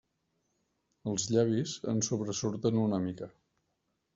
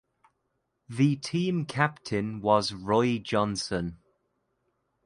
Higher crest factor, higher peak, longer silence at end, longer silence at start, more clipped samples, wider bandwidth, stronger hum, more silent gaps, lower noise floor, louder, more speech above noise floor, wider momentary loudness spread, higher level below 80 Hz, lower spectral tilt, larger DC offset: about the same, 20 dB vs 22 dB; second, -14 dBFS vs -8 dBFS; second, 0.85 s vs 1.1 s; first, 1.05 s vs 0.9 s; neither; second, 8 kHz vs 11.5 kHz; neither; neither; about the same, -80 dBFS vs -78 dBFS; second, -31 LUFS vs -28 LUFS; about the same, 49 dB vs 51 dB; first, 11 LU vs 7 LU; second, -68 dBFS vs -58 dBFS; about the same, -5.5 dB/octave vs -5.5 dB/octave; neither